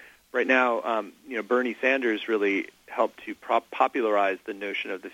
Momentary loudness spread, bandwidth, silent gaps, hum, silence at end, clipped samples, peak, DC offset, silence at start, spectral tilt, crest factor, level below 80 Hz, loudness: 10 LU; 16.5 kHz; none; none; 0.05 s; under 0.1%; -6 dBFS; under 0.1%; 0 s; -4.5 dB/octave; 20 dB; -76 dBFS; -26 LUFS